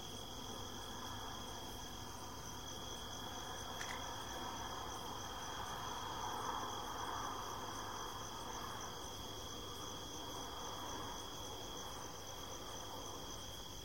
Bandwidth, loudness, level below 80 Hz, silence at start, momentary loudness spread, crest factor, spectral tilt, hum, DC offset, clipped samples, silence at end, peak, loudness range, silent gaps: 16.5 kHz; -46 LUFS; -60 dBFS; 0 s; 4 LU; 18 dB; -2.5 dB/octave; none; 0.2%; under 0.1%; 0 s; -30 dBFS; 3 LU; none